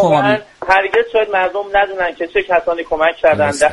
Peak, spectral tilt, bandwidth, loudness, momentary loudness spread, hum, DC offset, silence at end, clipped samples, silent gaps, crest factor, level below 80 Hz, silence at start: 0 dBFS; -4.5 dB/octave; 11.5 kHz; -15 LUFS; 6 LU; none; under 0.1%; 0 s; under 0.1%; none; 14 dB; -44 dBFS; 0 s